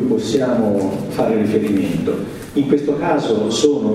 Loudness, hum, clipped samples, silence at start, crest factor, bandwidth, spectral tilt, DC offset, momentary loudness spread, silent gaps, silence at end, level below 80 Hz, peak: -18 LUFS; none; under 0.1%; 0 s; 16 dB; 15.5 kHz; -6 dB/octave; under 0.1%; 5 LU; none; 0 s; -48 dBFS; 0 dBFS